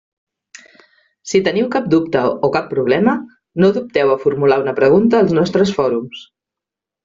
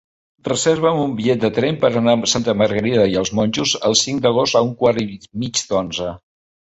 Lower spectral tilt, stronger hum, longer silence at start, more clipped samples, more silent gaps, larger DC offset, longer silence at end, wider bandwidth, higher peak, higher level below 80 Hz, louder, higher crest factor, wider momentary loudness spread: first, -5.5 dB/octave vs -4 dB/octave; neither; first, 1.25 s vs 0.45 s; neither; neither; neither; first, 0.8 s vs 0.6 s; about the same, 7.6 kHz vs 8.2 kHz; about the same, -2 dBFS vs 0 dBFS; about the same, -54 dBFS vs -50 dBFS; about the same, -15 LUFS vs -17 LUFS; about the same, 14 dB vs 18 dB; about the same, 10 LU vs 8 LU